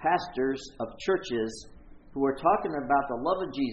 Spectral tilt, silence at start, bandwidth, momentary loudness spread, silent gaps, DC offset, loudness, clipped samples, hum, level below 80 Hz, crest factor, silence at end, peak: -5.5 dB/octave; 0 s; 8.4 kHz; 10 LU; none; under 0.1%; -29 LUFS; under 0.1%; none; -54 dBFS; 18 dB; 0 s; -10 dBFS